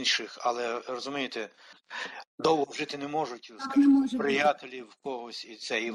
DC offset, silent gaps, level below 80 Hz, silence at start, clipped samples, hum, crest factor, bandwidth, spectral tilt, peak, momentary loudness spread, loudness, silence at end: under 0.1%; 2.27-2.38 s; -72 dBFS; 0 s; under 0.1%; none; 16 dB; 11 kHz; -3.5 dB/octave; -12 dBFS; 16 LU; -29 LUFS; 0 s